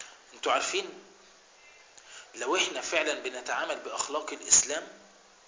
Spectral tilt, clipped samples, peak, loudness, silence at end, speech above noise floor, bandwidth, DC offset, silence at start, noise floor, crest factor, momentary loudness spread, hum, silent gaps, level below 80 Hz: 0.5 dB/octave; under 0.1%; -6 dBFS; -28 LUFS; 0.45 s; 27 dB; 7.8 kHz; under 0.1%; 0 s; -57 dBFS; 26 dB; 24 LU; none; none; -70 dBFS